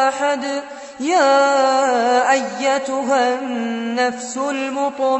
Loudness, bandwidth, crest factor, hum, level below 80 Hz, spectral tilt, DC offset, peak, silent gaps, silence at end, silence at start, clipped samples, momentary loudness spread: -18 LUFS; 8.4 kHz; 14 dB; none; -68 dBFS; -2.5 dB/octave; under 0.1%; -4 dBFS; none; 0 s; 0 s; under 0.1%; 9 LU